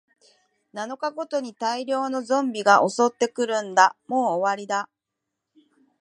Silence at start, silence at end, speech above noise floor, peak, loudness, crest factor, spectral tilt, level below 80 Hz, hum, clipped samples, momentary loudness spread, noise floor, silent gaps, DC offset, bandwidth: 0.75 s; 1.15 s; 60 dB; -2 dBFS; -23 LUFS; 22 dB; -3.5 dB/octave; -82 dBFS; none; under 0.1%; 12 LU; -83 dBFS; none; under 0.1%; 11 kHz